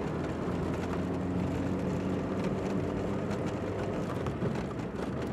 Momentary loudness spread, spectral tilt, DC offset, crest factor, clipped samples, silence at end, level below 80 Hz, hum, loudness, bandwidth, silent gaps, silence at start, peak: 2 LU; -7.5 dB/octave; under 0.1%; 12 dB; under 0.1%; 0 s; -50 dBFS; none; -33 LUFS; 12.5 kHz; none; 0 s; -20 dBFS